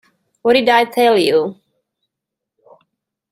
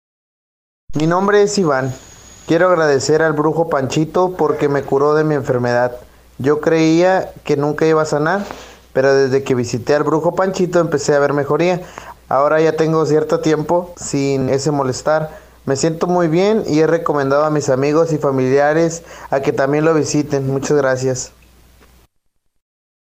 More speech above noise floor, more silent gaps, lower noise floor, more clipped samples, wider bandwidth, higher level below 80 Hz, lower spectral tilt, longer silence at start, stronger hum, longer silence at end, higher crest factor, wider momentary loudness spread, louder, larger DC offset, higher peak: first, 69 dB vs 49 dB; neither; first, -82 dBFS vs -64 dBFS; neither; about the same, 16 kHz vs 16 kHz; second, -62 dBFS vs -48 dBFS; second, -4 dB/octave vs -5.5 dB/octave; second, 0.45 s vs 0.9 s; neither; about the same, 1.8 s vs 1.8 s; about the same, 16 dB vs 12 dB; about the same, 8 LU vs 8 LU; about the same, -14 LUFS vs -16 LUFS; neither; about the same, -2 dBFS vs -4 dBFS